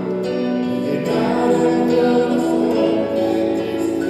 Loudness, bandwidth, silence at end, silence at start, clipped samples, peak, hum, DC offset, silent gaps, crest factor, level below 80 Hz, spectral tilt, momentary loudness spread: -18 LUFS; 13.5 kHz; 0 s; 0 s; under 0.1%; -4 dBFS; none; under 0.1%; none; 12 dB; -56 dBFS; -6.5 dB/octave; 5 LU